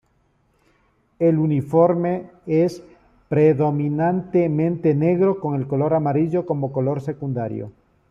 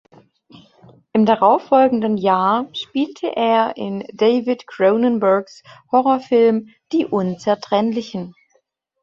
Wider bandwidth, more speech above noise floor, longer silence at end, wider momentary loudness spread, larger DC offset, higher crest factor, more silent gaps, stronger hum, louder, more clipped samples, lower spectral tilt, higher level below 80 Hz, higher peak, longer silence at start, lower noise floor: about the same, 7.4 kHz vs 7.4 kHz; about the same, 44 dB vs 47 dB; second, 0.4 s vs 0.75 s; about the same, 9 LU vs 10 LU; neither; about the same, 16 dB vs 16 dB; neither; neither; about the same, -20 LUFS vs -18 LUFS; neither; first, -10 dB/octave vs -7 dB/octave; first, -58 dBFS vs -64 dBFS; about the same, -4 dBFS vs -2 dBFS; about the same, 1.2 s vs 1.15 s; about the same, -63 dBFS vs -64 dBFS